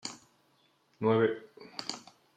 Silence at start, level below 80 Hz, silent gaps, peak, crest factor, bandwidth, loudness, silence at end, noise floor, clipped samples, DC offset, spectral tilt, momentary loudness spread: 0.05 s; -78 dBFS; none; -14 dBFS; 20 dB; 10.5 kHz; -32 LUFS; 0.35 s; -70 dBFS; under 0.1%; under 0.1%; -5 dB/octave; 18 LU